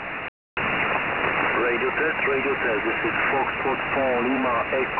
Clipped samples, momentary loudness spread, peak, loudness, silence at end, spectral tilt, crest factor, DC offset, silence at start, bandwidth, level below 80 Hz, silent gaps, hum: under 0.1%; 3 LU; -10 dBFS; -23 LUFS; 0 s; -8 dB/octave; 14 dB; 0.2%; 0 s; 4 kHz; -50 dBFS; 0.28-0.57 s; none